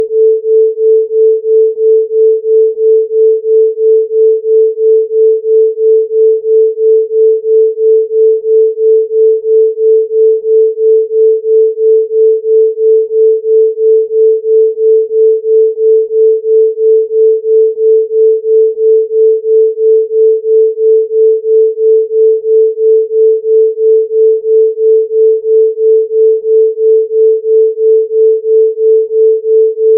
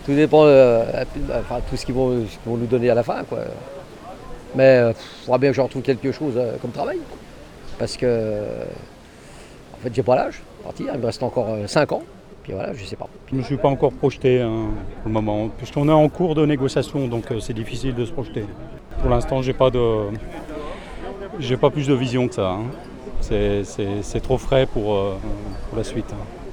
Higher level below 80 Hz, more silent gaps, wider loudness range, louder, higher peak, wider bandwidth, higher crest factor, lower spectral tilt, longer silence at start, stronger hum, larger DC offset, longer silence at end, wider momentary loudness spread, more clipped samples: second, -84 dBFS vs -36 dBFS; neither; second, 0 LU vs 5 LU; first, -9 LUFS vs -21 LUFS; about the same, -2 dBFS vs -2 dBFS; second, 0.5 kHz vs 12.5 kHz; second, 6 dB vs 20 dB; first, -10.5 dB/octave vs -7 dB/octave; about the same, 0 s vs 0 s; neither; neither; about the same, 0 s vs 0 s; second, 1 LU vs 17 LU; neither